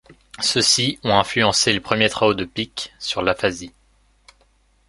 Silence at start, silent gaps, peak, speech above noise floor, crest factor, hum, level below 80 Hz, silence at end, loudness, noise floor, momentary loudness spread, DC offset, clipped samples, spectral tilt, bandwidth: 0.1 s; none; 0 dBFS; 39 dB; 22 dB; 50 Hz at -50 dBFS; -50 dBFS; 1.2 s; -19 LUFS; -59 dBFS; 11 LU; under 0.1%; under 0.1%; -2.5 dB/octave; 11.5 kHz